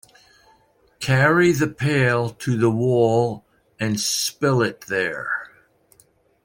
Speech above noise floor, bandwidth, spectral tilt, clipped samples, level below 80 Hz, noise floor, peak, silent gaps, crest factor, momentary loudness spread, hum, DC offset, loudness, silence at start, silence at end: 39 dB; 16.5 kHz; -5 dB/octave; under 0.1%; -58 dBFS; -59 dBFS; -4 dBFS; none; 16 dB; 10 LU; none; under 0.1%; -20 LUFS; 1 s; 1 s